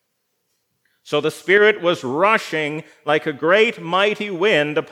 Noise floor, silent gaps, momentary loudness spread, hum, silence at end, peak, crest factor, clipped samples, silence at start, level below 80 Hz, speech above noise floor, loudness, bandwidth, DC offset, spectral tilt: -72 dBFS; none; 9 LU; none; 0.05 s; 0 dBFS; 18 dB; under 0.1%; 1.05 s; -82 dBFS; 54 dB; -18 LUFS; 14 kHz; under 0.1%; -4.5 dB/octave